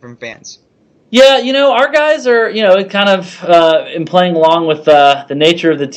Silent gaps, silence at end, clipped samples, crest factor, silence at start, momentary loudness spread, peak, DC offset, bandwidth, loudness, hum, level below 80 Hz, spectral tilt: none; 0 s; 0.5%; 10 dB; 0.05 s; 7 LU; 0 dBFS; under 0.1%; 10 kHz; -10 LUFS; none; -56 dBFS; -4.5 dB/octave